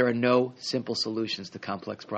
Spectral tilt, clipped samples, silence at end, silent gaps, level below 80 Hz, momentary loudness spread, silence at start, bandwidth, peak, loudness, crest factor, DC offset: -5 dB/octave; under 0.1%; 0 s; none; -72 dBFS; 12 LU; 0 s; 8.4 kHz; -10 dBFS; -28 LUFS; 18 dB; under 0.1%